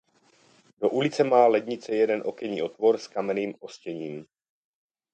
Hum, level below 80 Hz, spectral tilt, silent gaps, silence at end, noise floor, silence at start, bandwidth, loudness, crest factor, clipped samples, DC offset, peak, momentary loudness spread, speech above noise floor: none; -76 dBFS; -5.5 dB/octave; none; 0.9 s; -62 dBFS; 0.8 s; 8.8 kHz; -25 LUFS; 20 dB; under 0.1%; under 0.1%; -6 dBFS; 16 LU; 37 dB